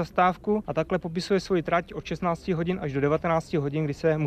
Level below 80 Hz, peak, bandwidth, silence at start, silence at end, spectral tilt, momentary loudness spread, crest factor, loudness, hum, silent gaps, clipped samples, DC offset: -50 dBFS; -10 dBFS; 13.5 kHz; 0 s; 0 s; -7 dB/octave; 5 LU; 16 dB; -27 LUFS; none; none; under 0.1%; under 0.1%